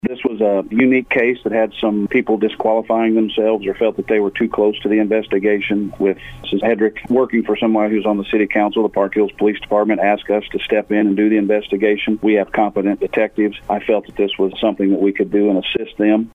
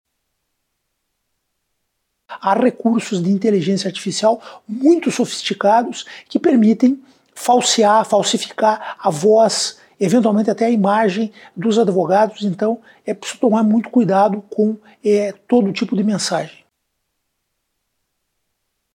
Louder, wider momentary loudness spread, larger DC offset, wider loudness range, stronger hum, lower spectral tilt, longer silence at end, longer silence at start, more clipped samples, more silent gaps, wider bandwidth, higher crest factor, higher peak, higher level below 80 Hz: about the same, -17 LUFS vs -17 LUFS; second, 4 LU vs 10 LU; neither; second, 1 LU vs 5 LU; neither; first, -8 dB/octave vs -5 dB/octave; second, 0.05 s vs 2.5 s; second, 0.05 s vs 2.3 s; neither; neither; second, 3.9 kHz vs 16 kHz; about the same, 14 dB vs 14 dB; about the same, -2 dBFS vs -4 dBFS; first, -48 dBFS vs -70 dBFS